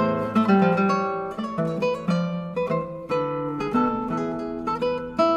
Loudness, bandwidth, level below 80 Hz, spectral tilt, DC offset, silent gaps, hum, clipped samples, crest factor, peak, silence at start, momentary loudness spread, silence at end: -24 LUFS; 9.8 kHz; -54 dBFS; -7.5 dB/octave; under 0.1%; none; none; under 0.1%; 16 dB; -6 dBFS; 0 s; 9 LU; 0 s